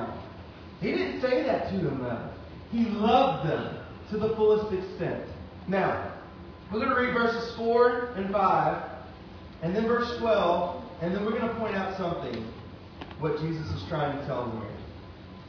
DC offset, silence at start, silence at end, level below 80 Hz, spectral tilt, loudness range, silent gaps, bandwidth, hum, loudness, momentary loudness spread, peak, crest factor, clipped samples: under 0.1%; 0 s; 0 s; -52 dBFS; -7.5 dB/octave; 5 LU; none; 5.4 kHz; none; -28 LUFS; 20 LU; -10 dBFS; 20 dB; under 0.1%